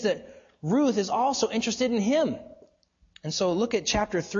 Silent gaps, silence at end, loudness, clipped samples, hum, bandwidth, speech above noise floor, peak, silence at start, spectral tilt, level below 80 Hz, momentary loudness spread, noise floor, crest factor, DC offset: none; 0 s; -26 LUFS; under 0.1%; none; 7.6 kHz; 39 dB; -12 dBFS; 0 s; -4 dB/octave; -54 dBFS; 10 LU; -64 dBFS; 16 dB; under 0.1%